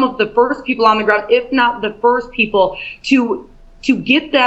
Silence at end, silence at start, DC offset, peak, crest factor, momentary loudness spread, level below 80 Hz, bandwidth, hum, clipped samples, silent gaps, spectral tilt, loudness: 0 s; 0 s; under 0.1%; 0 dBFS; 14 dB; 5 LU; -46 dBFS; 8.2 kHz; none; under 0.1%; none; -5 dB/octave; -15 LUFS